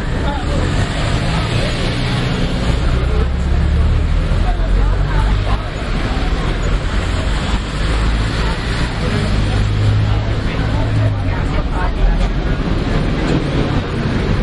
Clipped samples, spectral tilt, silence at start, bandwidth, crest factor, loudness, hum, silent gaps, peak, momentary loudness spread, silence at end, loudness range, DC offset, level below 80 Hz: under 0.1%; -6.5 dB/octave; 0 s; 11 kHz; 12 dB; -18 LUFS; none; none; -2 dBFS; 3 LU; 0 s; 2 LU; under 0.1%; -18 dBFS